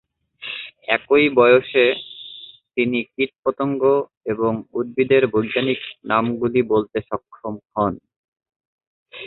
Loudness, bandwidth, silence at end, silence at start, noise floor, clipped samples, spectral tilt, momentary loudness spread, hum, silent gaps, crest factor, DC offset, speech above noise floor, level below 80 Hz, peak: -20 LUFS; 4.3 kHz; 0 s; 0.4 s; -42 dBFS; under 0.1%; -10.5 dB/octave; 16 LU; none; 3.39-3.43 s, 4.17-4.21 s, 8.16-8.32 s, 8.56-8.60 s, 8.67-8.78 s, 8.87-9.06 s; 18 dB; under 0.1%; 23 dB; -56 dBFS; -2 dBFS